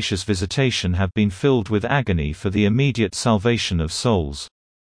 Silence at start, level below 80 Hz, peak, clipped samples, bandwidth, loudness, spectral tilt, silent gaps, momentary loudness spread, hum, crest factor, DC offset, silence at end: 0 s; -38 dBFS; -4 dBFS; under 0.1%; 10.5 kHz; -20 LUFS; -5.5 dB/octave; none; 5 LU; none; 16 dB; under 0.1%; 0.5 s